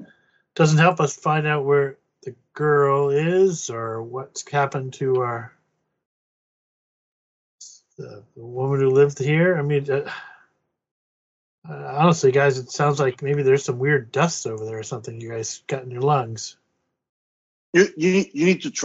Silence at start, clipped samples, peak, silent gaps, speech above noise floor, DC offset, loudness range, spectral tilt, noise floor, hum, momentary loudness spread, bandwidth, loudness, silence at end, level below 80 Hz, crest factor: 0 s; under 0.1%; -2 dBFS; 6.05-7.58 s, 10.91-11.62 s, 17.09-17.73 s; 44 dB; under 0.1%; 8 LU; -5.5 dB/octave; -64 dBFS; none; 18 LU; 8 kHz; -21 LUFS; 0 s; -64 dBFS; 20 dB